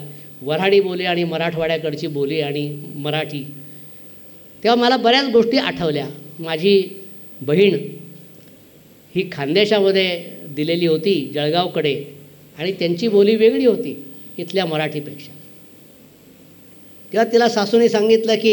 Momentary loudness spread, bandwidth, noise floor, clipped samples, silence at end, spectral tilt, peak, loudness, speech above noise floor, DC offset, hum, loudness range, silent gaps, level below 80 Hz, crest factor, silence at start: 20 LU; 19 kHz; -47 dBFS; under 0.1%; 0 s; -5.5 dB/octave; -4 dBFS; -18 LUFS; 29 dB; under 0.1%; none; 5 LU; none; -62 dBFS; 16 dB; 0 s